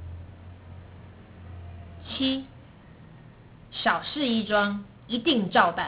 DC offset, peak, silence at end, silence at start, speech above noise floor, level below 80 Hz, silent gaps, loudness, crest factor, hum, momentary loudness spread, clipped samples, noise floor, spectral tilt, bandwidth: under 0.1%; -6 dBFS; 0 s; 0 s; 24 dB; -50 dBFS; none; -26 LUFS; 24 dB; none; 24 LU; under 0.1%; -49 dBFS; -2.5 dB/octave; 4 kHz